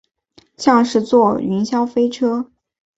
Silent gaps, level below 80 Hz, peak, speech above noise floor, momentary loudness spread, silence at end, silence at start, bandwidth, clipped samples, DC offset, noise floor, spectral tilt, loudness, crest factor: none; -58 dBFS; -2 dBFS; 38 dB; 6 LU; 0.55 s; 0.6 s; 8 kHz; under 0.1%; under 0.1%; -54 dBFS; -6 dB/octave; -17 LUFS; 16 dB